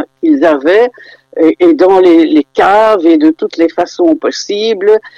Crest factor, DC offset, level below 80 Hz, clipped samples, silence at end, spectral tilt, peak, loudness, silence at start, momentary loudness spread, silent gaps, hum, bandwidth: 8 dB; under 0.1%; -52 dBFS; under 0.1%; 0.1 s; -4.5 dB/octave; 0 dBFS; -9 LUFS; 0 s; 7 LU; none; none; 7.4 kHz